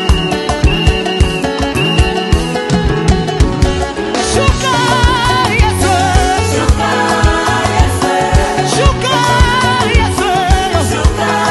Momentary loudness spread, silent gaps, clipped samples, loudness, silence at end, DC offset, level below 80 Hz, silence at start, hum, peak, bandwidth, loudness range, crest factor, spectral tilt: 3 LU; none; under 0.1%; -12 LUFS; 0 s; under 0.1%; -16 dBFS; 0 s; none; 0 dBFS; 12.5 kHz; 2 LU; 12 dB; -4.5 dB/octave